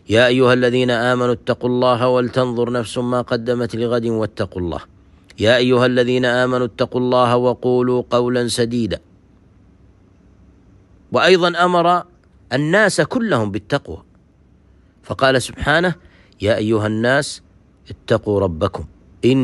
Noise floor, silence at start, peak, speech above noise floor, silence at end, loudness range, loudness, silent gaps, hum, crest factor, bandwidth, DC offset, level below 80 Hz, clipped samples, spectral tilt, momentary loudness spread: -52 dBFS; 0.1 s; 0 dBFS; 35 dB; 0 s; 4 LU; -17 LUFS; none; none; 16 dB; 12 kHz; under 0.1%; -46 dBFS; under 0.1%; -5.5 dB/octave; 10 LU